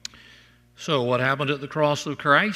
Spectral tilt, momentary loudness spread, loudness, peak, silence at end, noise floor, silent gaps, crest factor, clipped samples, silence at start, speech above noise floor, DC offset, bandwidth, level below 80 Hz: -5 dB/octave; 10 LU; -23 LUFS; -4 dBFS; 0 s; -53 dBFS; none; 20 dB; under 0.1%; 0.8 s; 31 dB; under 0.1%; 15 kHz; -64 dBFS